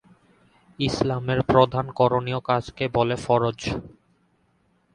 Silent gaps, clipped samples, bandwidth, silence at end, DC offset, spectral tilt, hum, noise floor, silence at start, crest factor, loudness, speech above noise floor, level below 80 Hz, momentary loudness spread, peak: none; under 0.1%; 11 kHz; 1.05 s; under 0.1%; -6.5 dB/octave; none; -65 dBFS; 0.8 s; 22 dB; -23 LUFS; 43 dB; -48 dBFS; 9 LU; -2 dBFS